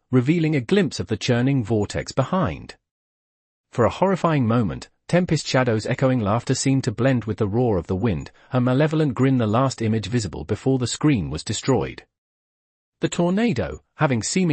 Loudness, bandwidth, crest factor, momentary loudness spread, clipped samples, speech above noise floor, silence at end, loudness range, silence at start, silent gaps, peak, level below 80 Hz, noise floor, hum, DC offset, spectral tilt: -22 LUFS; 8.8 kHz; 16 dB; 7 LU; under 0.1%; over 69 dB; 0 s; 3 LU; 0.1 s; 2.91-3.64 s, 12.18-12.92 s; -6 dBFS; -48 dBFS; under -90 dBFS; none; under 0.1%; -6 dB/octave